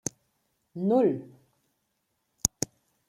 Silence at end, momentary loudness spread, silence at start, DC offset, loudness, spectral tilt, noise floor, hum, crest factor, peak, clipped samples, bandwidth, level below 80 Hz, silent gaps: 0.6 s; 13 LU; 0.75 s; under 0.1%; -28 LUFS; -4.5 dB/octave; -77 dBFS; none; 30 dB; -2 dBFS; under 0.1%; 16.5 kHz; -60 dBFS; none